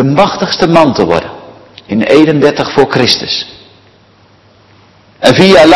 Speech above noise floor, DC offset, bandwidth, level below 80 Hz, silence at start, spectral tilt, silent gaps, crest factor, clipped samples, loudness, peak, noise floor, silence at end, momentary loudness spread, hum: 37 dB; under 0.1%; 12 kHz; -42 dBFS; 0 s; -5.5 dB/octave; none; 10 dB; 4%; -9 LUFS; 0 dBFS; -44 dBFS; 0 s; 10 LU; none